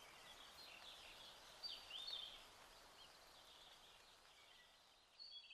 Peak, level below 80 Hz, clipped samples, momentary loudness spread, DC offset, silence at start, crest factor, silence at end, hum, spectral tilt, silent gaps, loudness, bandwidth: -40 dBFS; -80 dBFS; under 0.1%; 15 LU; under 0.1%; 0 s; 20 dB; 0 s; none; 0 dB/octave; none; -57 LUFS; 14 kHz